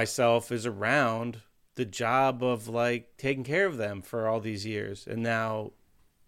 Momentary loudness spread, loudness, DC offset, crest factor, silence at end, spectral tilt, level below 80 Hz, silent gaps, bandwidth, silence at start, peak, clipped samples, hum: 11 LU; -29 LUFS; under 0.1%; 18 dB; 0.55 s; -5 dB/octave; -66 dBFS; none; 16 kHz; 0 s; -12 dBFS; under 0.1%; none